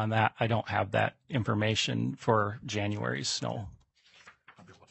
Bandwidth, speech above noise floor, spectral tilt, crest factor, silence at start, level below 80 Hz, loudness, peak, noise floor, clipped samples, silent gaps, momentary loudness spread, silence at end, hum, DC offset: 8.4 kHz; 32 dB; -5 dB/octave; 22 dB; 0 s; -64 dBFS; -30 LUFS; -8 dBFS; -62 dBFS; under 0.1%; none; 6 LU; 0.2 s; none; under 0.1%